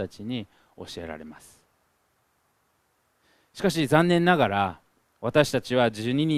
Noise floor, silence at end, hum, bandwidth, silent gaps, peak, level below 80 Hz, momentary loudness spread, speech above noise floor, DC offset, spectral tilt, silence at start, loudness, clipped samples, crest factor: -70 dBFS; 0 s; none; 15 kHz; none; -4 dBFS; -58 dBFS; 21 LU; 45 dB; under 0.1%; -6 dB/octave; 0 s; -24 LUFS; under 0.1%; 24 dB